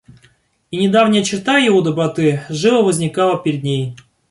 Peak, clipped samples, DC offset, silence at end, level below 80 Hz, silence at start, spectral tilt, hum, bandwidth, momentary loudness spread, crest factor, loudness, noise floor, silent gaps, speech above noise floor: -2 dBFS; under 0.1%; under 0.1%; 0.35 s; -56 dBFS; 0.7 s; -5 dB/octave; none; 11.5 kHz; 8 LU; 14 dB; -15 LUFS; -55 dBFS; none; 40 dB